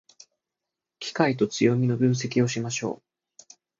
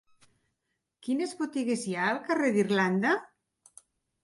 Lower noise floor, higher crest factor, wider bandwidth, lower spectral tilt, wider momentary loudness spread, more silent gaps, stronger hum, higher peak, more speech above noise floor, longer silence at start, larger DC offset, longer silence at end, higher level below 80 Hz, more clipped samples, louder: first, -87 dBFS vs -82 dBFS; about the same, 20 dB vs 18 dB; second, 7.8 kHz vs 11.5 kHz; about the same, -5.5 dB/octave vs -5.5 dB/octave; first, 12 LU vs 7 LU; neither; neither; first, -6 dBFS vs -14 dBFS; first, 63 dB vs 54 dB; about the same, 1 s vs 1.05 s; neither; about the same, 0.85 s vs 0.95 s; first, -68 dBFS vs -78 dBFS; neither; first, -25 LUFS vs -28 LUFS